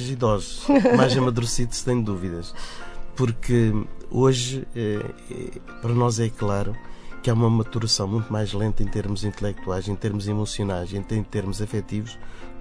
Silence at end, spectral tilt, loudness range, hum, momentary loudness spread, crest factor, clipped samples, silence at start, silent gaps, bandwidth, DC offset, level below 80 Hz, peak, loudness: 0 s; -6 dB/octave; 5 LU; none; 15 LU; 22 dB; under 0.1%; 0 s; none; 11 kHz; under 0.1%; -36 dBFS; -2 dBFS; -24 LUFS